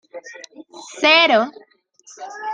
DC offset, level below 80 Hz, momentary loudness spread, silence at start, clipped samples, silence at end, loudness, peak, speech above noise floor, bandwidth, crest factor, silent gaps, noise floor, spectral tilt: under 0.1%; -74 dBFS; 26 LU; 0.15 s; under 0.1%; 0 s; -14 LUFS; -2 dBFS; 29 dB; 9.6 kHz; 20 dB; none; -49 dBFS; -2 dB/octave